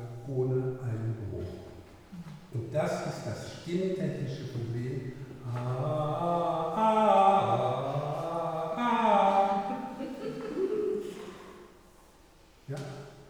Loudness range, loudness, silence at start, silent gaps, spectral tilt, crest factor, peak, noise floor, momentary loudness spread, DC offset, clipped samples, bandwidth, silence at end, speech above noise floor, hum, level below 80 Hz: 9 LU; -30 LUFS; 0 s; none; -7 dB/octave; 20 dB; -12 dBFS; -58 dBFS; 18 LU; under 0.1%; under 0.1%; 18.5 kHz; 0 s; 25 dB; none; -62 dBFS